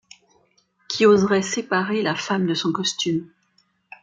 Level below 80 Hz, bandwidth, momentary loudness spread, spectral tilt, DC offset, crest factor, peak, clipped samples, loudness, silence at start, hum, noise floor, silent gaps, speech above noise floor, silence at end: -64 dBFS; 9.4 kHz; 8 LU; -4.5 dB/octave; under 0.1%; 18 dB; -4 dBFS; under 0.1%; -21 LUFS; 0.9 s; none; -65 dBFS; none; 45 dB; 0.75 s